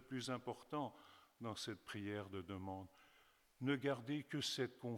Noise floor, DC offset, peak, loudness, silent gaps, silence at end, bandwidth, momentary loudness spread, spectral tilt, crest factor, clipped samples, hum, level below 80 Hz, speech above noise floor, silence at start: -73 dBFS; under 0.1%; -28 dBFS; -46 LUFS; none; 0 s; 18.5 kHz; 11 LU; -5 dB/octave; 20 dB; under 0.1%; none; -82 dBFS; 27 dB; 0 s